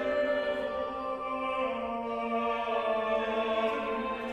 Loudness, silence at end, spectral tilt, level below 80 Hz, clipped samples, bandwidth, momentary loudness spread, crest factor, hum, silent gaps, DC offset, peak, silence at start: -31 LUFS; 0 s; -5.5 dB/octave; -60 dBFS; under 0.1%; 10.5 kHz; 5 LU; 14 dB; none; none; under 0.1%; -16 dBFS; 0 s